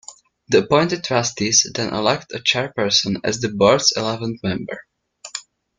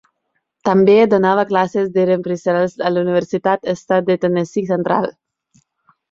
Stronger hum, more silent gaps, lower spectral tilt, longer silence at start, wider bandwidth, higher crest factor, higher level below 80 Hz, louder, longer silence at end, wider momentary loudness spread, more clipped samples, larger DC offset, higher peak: neither; neither; second, -3 dB/octave vs -7 dB/octave; second, 0.1 s vs 0.65 s; first, 11 kHz vs 7.6 kHz; about the same, 20 dB vs 16 dB; first, -54 dBFS vs -60 dBFS; about the same, -18 LUFS vs -16 LUFS; second, 0.35 s vs 1 s; first, 17 LU vs 8 LU; neither; neither; about the same, -2 dBFS vs 0 dBFS